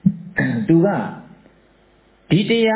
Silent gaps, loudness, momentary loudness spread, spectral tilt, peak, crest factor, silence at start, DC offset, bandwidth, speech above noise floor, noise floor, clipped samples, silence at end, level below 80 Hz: none; -18 LUFS; 12 LU; -11 dB/octave; -4 dBFS; 16 dB; 0.05 s; under 0.1%; 4 kHz; 38 dB; -54 dBFS; under 0.1%; 0 s; -52 dBFS